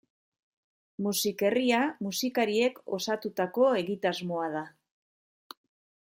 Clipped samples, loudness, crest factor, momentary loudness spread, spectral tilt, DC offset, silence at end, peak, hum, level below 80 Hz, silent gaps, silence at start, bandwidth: under 0.1%; -29 LUFS; 18 dB; 9 LU; -4 dB/octave; under 0.1%; 1.45 s; -12 dBFS; none; -78 dBFS; none; 1 s; 16.5 kHz